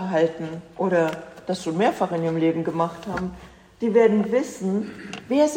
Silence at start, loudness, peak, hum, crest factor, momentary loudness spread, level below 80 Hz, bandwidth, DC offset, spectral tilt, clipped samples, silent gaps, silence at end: 0 s; -23 LUFS; -6 dBFS; none; 16 dB; 15 LU; -56 dBFS; 16 kHz; under 0.1%; -6.5 dB/octave; under 0.1%; none; 0 s